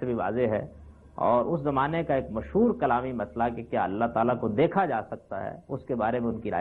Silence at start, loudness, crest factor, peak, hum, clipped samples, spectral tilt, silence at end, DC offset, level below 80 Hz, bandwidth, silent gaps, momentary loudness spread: 0 s; -27 LUFS; 16 dB; -10 dBFS; none; under 0.1%; -10 dB/octave; 0 s; under 0.1%; -52 dBFS; 4.3 kHz; none; 11 LU